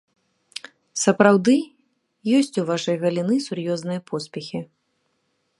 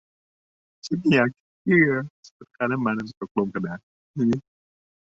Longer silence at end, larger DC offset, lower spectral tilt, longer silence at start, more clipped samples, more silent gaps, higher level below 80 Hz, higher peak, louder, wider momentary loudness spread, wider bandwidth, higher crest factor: first, 0.95 s vs 0.65 s; neither; second, -5 dB/octave vs -7 dB/octave; about the same, 0.95 s vs 0.85 s; neither; second, none vs 1.40-1.65 s, 2.10-2.23 s, 2.31-2.40 s, 3.17-3.21 s, 3.31-3.35 s, 3.83-4.14 s; second, -70 dBFS vs -62 dBFS; first, 0 dBFS vs -6 dBFS; about the same, -22 LUFS vs -24 LUFS; first, 21 LU vs 16 LU; first, 11.5 kHz vs 7.8 kHz; about the same, 22 dB vs 18 dB